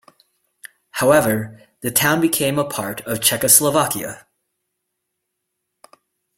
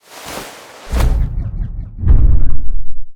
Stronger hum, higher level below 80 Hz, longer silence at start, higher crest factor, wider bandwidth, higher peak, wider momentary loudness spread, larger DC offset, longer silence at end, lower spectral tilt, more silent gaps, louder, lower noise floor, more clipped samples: neither; second, -56 dBFS vs -14 dBFS; first, 0.95 s vs 0.25 s; first, 20 dB vs 10 dB; first, 16.5 kHz vs 12.5 kHz; about the same, 0 dBFS vs 0 dBFS; about the same, 16 LU vs 16 LU; neither; first, 2.2 s vs 0 s; second, -3 dB/octave vs -6 dB/octave; neither; about the same, -17 LUFS vs -19 LUFS; first, -77 dBFS vs -33 dBFS; neither